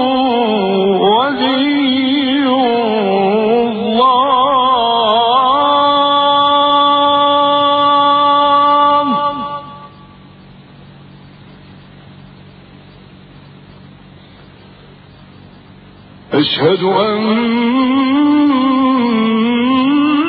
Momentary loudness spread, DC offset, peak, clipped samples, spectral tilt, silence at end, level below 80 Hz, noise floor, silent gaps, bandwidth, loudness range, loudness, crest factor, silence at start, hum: 4 LU; under 0.1%; 0 dBFS; under 0.1%; -8.5 dB/octave; 0 s; -52 dBFS; -39 dBFS; none; 4.9 kHz; 8 LU; -12 LUFS; 14 dB; 0 s; none